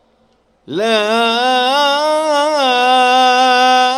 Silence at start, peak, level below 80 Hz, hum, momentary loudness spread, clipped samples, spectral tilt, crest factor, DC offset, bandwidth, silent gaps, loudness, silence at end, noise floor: 0.7 s; 0 dBFS; -62 dBFS; none; 4 LU; under 0.1%; -2 dB/octave; 12 dB; under 0.1%; 15 kHz; none; -12 LUFS; 0 s; -56 dBFS